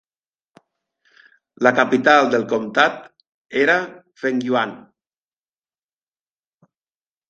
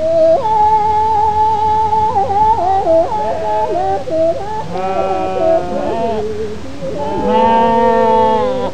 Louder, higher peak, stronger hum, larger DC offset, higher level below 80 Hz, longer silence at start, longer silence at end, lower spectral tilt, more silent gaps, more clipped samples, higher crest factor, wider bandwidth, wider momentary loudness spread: second, -18 LUFS vs -14 LUFS; about the same, 0 dBFS vs 0 dBFS; neither; second, under 0.1% vs 6%; second, -68 dBFS vs -38 dBFS; first, 1.6 s vs 0 s; first, 2.5 s vs 0 s; second, -4.5 dB/octave vs -6.5 dB/octave; first, 3.34-3.45 s vs none; neither; first, 22 dB vs 12 dB; second, 7.8 kHz vs 9.4 kHz; first, 13 LU vs 9 LU